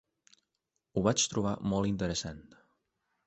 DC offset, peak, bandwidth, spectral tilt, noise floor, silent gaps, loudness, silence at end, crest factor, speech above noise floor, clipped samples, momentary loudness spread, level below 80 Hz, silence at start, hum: under 0.1%; -12 dBFS; 8.4 kHz; -4.5 dB/octave; -84 dBFS; none; -31 LUFS; 0.85 s; 22 dB; 53 dB; under 0.1%; 12 LU; -56 dBFS; 0.95 s; none